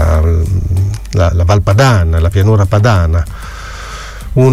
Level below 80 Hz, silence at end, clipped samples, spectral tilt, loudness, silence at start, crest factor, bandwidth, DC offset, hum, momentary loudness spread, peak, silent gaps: -18 dBFS; 0 s; under 0.1%; -7 dB/octave; -11 LUFS; 0 s; 10 dB; 13.5 kHz; under 0.1%; none; 17 LU; 0 dBFS; none